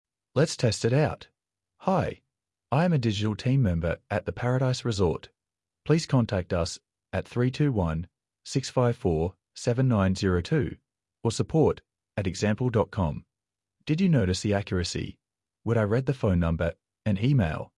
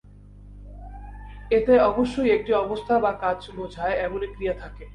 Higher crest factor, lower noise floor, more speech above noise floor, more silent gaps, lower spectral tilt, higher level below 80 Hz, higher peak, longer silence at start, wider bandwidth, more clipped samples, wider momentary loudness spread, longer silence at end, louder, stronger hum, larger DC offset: about the same, 18 dB vs 18 dB; first, -90 dBFS vs -46 dBFS; first, 64 dB vs 23 dB; neither; about the same, -6.5 dB/octave vs -7 dB/octave; second, -50 dBFS vs -42 dBFS; about the same, -10 dBFS vs -8 dBFS; about the same, 0.35 s vs 0.25 s; about the same, 11.5 kHz vs 10.5 kHz; neither; second, 11 LU vs 23 LU; first, 0.15 s vs 0 s; second, -27 LUFS vs -23 LUFS; second, none vs 50 Hz at -40 dBFS; neither